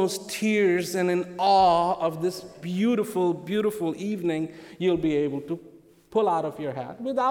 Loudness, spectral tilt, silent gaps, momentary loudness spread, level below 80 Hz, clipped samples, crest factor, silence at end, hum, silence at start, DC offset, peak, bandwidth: -25 LUFS; -5.5 dB/octave; none; 12 LU; -58 dBFS; under 0.1%; 14 dB; 0 s; none; 0 s; under 0.1%; -10 dBFS; 17.5 kHz